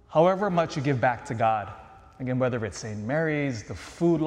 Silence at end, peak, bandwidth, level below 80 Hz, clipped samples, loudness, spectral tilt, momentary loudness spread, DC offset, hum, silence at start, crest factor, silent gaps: 0 s; -8 dBFS; 11 kHz; -56 dBFS; under 0.1%; -27 LUFS; -6.5 dB/octave; 14 LU; under 0.1%; none; 0.1 s; 18 dB; none